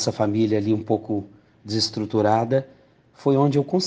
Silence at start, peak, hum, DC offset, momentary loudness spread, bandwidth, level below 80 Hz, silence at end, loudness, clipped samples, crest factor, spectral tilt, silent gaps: 0 s; -6 dBFS; none; under 0.1%; 8 LU; 9.6 kHz; -62 dBFS; 0 s; -22 LUFS; under 0.1%; 16 dB; -6 dB/octave; none